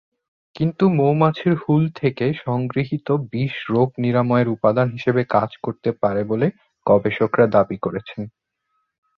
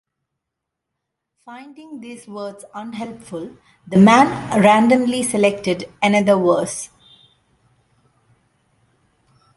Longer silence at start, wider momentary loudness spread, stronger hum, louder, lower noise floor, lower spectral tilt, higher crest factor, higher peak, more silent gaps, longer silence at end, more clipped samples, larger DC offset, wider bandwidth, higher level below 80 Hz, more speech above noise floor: second, 0.55 s vs 1.45 s; second, 9 LU vs 24 LU; neither; second, -20 LUFS vs -15 LUFS; second, -72 dBFS vs -81 dBFS; first, -10 dB/octave vs -5.5 dB/octave; about the same, 18 dB vs 18 dB; about the same, -2 dBFS vs -2 dBFS; neither; second, 0.9 s vs 2.7 s; neither; neither; second, 6 kHz vs 11.5 kHz; about the same, -56 dBFS vs -58 dBFS; second, 53 dB vs 64 dB